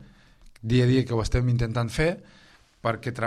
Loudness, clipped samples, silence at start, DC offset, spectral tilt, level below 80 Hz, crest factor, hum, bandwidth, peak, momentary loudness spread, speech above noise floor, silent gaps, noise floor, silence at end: -25 LUFS; under 0.1%; 0 s; under 0.1%; -7 dB/octave; -38 dBFS; 16 dB; none; 12 kHz; -10 dBFS; 10 LU; 28 dB; none; -52 dBFS; 0 s